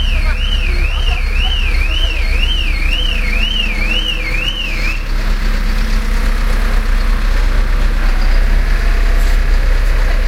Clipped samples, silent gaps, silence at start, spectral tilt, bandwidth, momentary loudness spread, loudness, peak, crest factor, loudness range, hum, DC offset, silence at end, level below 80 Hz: under 0.1%; none; 0 s; -4 dB/octave; 12 kHz; 3 LU; -17 LUFS; -2 dBFS; 10 dB; 2 LU; none; under 0.1%; 0 s; -12 dBFS